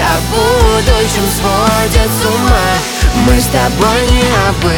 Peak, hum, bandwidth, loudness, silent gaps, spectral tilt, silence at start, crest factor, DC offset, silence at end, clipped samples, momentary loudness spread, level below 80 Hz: 0 dBFS; none; over 20 kHz; -11 LUFS; none; -4.5 dB/octave; 0 s; 10 dB; under 0.1%; 0 s; under 0.1%; 3 LU; -16 dBFS